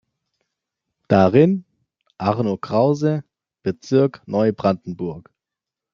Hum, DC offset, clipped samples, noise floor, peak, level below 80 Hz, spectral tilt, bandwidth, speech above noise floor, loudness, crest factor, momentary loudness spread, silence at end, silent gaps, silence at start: none; under 0.1%; under 0.1%; -86 dBFS; -2 dBFS; -62 dBFS; -8.5 dB/octave; 7.2 kHz; 68 dB; -20 LUFS; 18 dB; 14 LU; 0.75 s; none; 1.1 s